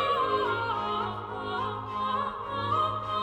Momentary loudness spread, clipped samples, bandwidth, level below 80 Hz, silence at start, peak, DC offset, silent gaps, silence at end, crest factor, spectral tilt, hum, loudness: 6 LU; under 0.1%; 10.5 kHz; -56 dBFS; 0 s; -14 dBFS; under 0.1%; none; 0 s; 14 dB; -6 dB/octave; none; -30 LUFS